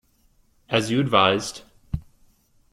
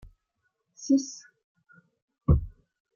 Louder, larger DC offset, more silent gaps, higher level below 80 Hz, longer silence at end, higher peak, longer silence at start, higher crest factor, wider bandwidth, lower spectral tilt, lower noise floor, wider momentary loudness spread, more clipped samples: first, -22 LUFS vs -27 LUFS; neither; second, none vs 1.44-1.55 s, 2.02-2.08 s; second, -46 dBFS vs -38 dBFS; first, 0.7 s vs 0.45 s; first, -2 dBFS vs -10 dBFS; about the same, 0.7 s vs 0.8 s; about the same, 24 dB vs 22 dB; first, 15 kHz vs 7.4 kHz; second, -4.5 dB/octave vs -7 dB/octave; second, -61 dBFS vs -78 dBFS; second, 16 LU vs 19 LU; neither